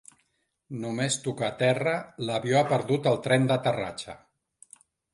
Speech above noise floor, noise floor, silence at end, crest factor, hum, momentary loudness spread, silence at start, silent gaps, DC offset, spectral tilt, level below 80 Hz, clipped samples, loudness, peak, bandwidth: 48 dB; -74 dBFS; 0.95 s; 22 dB; none; 12 LU; 0.7 s; none; under 0.1%; -5 dB/octave; -66 dBFS; under 0.1%; -26 LUFS; -6 dBFS; 11.5 kHz